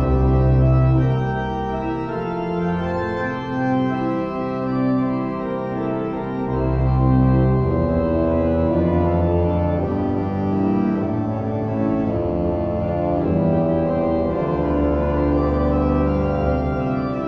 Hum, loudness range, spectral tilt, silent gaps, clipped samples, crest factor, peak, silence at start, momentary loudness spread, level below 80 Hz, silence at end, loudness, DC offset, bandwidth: none; 4 LU; -10.5 dB/octave; none; under 0.1%; 14 dB; -6 dBFS; 0 s; 7 LU; -28 dBFS; 0 s; -20 LUFS; under 0.1%; 5.8 kHz